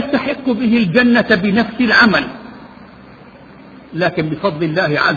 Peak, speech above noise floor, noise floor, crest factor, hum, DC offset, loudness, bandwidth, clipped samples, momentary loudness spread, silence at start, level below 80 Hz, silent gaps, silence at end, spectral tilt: 0 dBFS; 25 dB; -39 dBFS; 16 dB; none; under 0.1%; -14 LUFS; 7 kHz; under 0.1%; 12 LU; 0 s; -48 dBFS; none; 0 s; -7 dB/octave